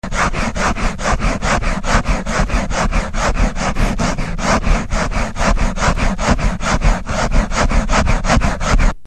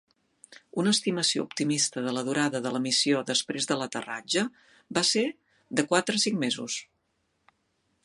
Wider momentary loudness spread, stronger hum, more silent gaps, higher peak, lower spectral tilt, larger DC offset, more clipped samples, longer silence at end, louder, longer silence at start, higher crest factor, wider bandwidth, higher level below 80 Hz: second, 3 LU vs 9 LU; neither; neither; first, 0 dBFS vs -8 dBFS; first, -4.5 dB/octave vs -3 dB/octave; first, 3% vs under 0.1%; neither; second, 0.1 s vs 1.2 s; first, -18 LUFS vs -27 LUFS; second, 0 s vs 0.5 s; second, 16 dB vs 22 dB; second, 10 kHz vs 11.5 kHz; first, -18 dBFS vs -74 dBFS